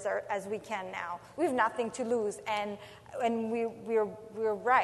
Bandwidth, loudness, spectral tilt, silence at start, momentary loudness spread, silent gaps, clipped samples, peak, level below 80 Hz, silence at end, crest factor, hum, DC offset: 12 kHz; -33 LUFS; -4.5 dB/octave; 0 s; 9 LU; none; under 0.1%; -12 dBFS; -72 dBFS; 0 s; 20 dB; none; under 0.1%